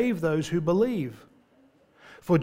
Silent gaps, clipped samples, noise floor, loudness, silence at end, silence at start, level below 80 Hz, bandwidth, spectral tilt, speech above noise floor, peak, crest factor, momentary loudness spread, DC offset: none; under 0.1%; -61 dBFS; -26 LUFS; 0 s; 0 s; -60 dBFS; 16 kHz; -7.5 dB/octave; 35 dB; -10 dBFS; 16 dB; 12 LU; under 0.1%